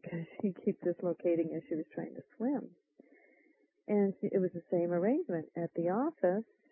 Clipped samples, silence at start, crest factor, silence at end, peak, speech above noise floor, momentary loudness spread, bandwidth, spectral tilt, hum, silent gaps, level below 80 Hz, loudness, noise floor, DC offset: under 0.1%; 0.05 s; 18 dB; 0.3 s; -18 dBFS; 36 dB; 10 LU; 3.2 kHz; -6 dB/octave; none; none; -86 dBFS; -35 LUFS; -70 dBFS; under 0.1%